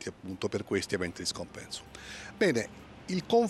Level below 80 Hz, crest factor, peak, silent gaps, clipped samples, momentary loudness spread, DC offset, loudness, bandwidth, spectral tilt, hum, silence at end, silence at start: -60 dBFS; 18 dB; -14 dBFS; none; under 0.1%; 15 LU; under 0.1%; -33 LUFS; 13 kHz; -4.5 dB/octave; none; 0 s; 0 s